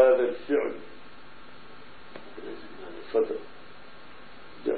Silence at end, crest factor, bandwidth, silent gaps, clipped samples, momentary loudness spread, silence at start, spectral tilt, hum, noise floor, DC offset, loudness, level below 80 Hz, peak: 0 s; 22 dB; 4.7 kHz; none; under 0.1%; 22 LU; 0 s; -8.5 dB/octave; 50 Hz at -65 dBFS; -50 dBFS; 0.9%; -29 LUFS; -66 dBFS; -8 dBFS